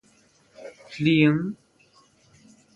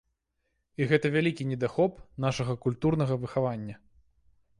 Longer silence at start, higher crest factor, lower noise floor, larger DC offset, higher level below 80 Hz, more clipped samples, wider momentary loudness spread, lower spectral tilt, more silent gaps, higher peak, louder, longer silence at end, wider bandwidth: second, 0.6 s vs 0.8 s; about the same, 20 dB vs 20 dB; second, -60 dBFS vs -78 dBFS; neither; second, -64 dBFS vs -58 dBFS; neither; first, 26 LU vs 7 LU; about the same, -7.5 dB/octave vs -7 dB/octave; neither; first, -6 dBFS vs -10 dBFS; first, -22 LUFS vs -29 LUFS; first, 1.2 s vs 0.85 s; second, 8 kHz vs 11 kHz